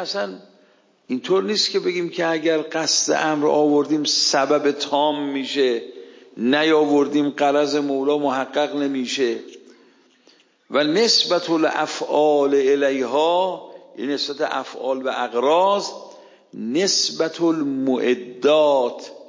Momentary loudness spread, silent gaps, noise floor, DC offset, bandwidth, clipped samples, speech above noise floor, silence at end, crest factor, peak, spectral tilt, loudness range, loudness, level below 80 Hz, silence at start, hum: 9 LU; none; -57 dBFS; under 0.1%; 7.6 kHz; under 0.1%; 37 dB; 0 s; 16 dB; -4 dBFS; -3 dB/octave; 3 LU; -20 LUFS; -78 dBFS; 0 s; none